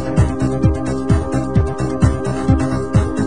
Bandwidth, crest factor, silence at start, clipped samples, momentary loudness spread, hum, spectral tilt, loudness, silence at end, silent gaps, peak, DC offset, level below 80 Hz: 10 kHz; 16 dB; 0 s; under 0.1%; 2 LU; none; -8 dB/octave; -17 LUFS; 0 s; none; 0 dBFS; 3%; -24 dBFS